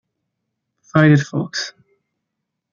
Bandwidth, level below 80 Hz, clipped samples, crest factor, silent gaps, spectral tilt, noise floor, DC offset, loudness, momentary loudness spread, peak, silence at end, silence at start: 7.2 kHz; -60 dBFS; under 0.1%; 18 dB; none; -6.5 dB/octave; -78 dBFS; under 0.1%; -17 LUFS; 13 LU; -2 dBFS; 1 s; 0.95 s